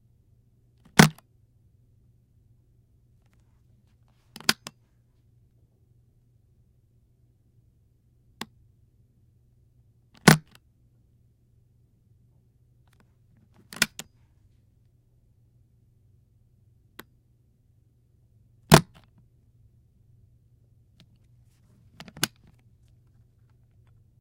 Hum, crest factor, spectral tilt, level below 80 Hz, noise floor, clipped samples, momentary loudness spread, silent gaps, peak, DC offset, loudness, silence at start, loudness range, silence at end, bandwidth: none; 32 dB; -4 dB/octave; -56 dBFS; -63 dBFS; under 0.1%; 31 LU; none; 0 dBFS; under 0.1%; -22 LUFS; 0.95 s; 24 LU; 1.95 s; 16 kHz